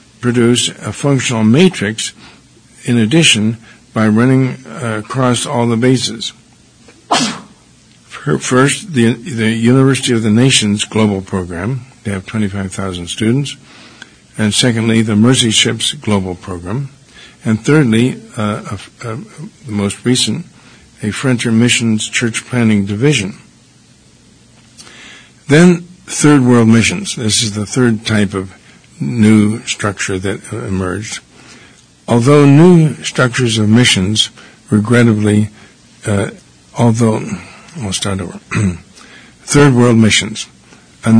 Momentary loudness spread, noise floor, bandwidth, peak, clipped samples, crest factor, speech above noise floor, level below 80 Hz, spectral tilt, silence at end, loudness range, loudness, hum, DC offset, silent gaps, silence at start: 15 LU; -45 dBFS; 10.5 kHz; 0 dBFS; 0.3%; 14 dB; 33 dB; -46 dBFS; -5 dB/octave; 0 s; 6 LU; -13 LUFS; none; under 0.1%; none; 0.2 s